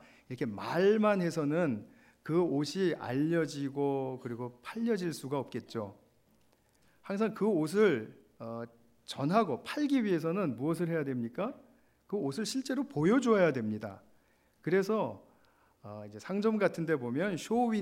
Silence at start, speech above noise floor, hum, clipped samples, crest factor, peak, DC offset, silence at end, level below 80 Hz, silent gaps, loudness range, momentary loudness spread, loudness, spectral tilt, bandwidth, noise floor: 0.3 s; 37 dB; none; under 0.1%; 18 dB; -14 dBFS; under 0.1%; 0 s; -76 dBFS; none; 4 LU; 15 LU; -32 LUFS; -6.5 dB/octave; 16 kHz; -69 dBFS